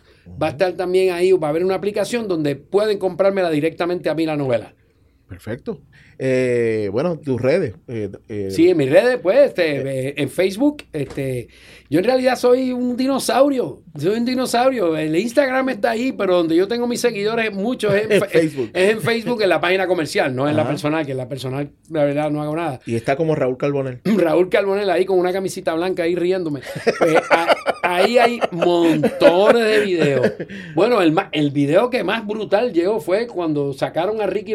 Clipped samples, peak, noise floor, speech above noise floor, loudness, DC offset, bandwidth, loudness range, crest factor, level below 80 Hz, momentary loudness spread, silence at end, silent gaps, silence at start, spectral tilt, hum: under 0.1%; 0 dBFS; -56 dBFS; 38 dB; -18 LUFS; under 0.1%; 15.5 kHz; 5 LU; 18 dB; -56 dBFS; 9 LU; 0 s; none; 0.25 s; -5.5 dB/octave; none